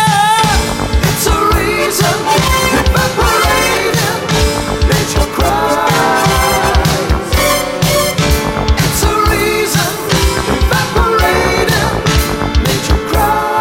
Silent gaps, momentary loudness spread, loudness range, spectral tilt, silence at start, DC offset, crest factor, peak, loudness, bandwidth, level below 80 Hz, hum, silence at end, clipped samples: none; 3 LU; 1 LU; -4 dB/octave; 0 s; under 0.1%; 12 dB; 0 dBFS; -12 LUFS; 17 kHz; -18 dBFS; none; 0 s; under 0.1%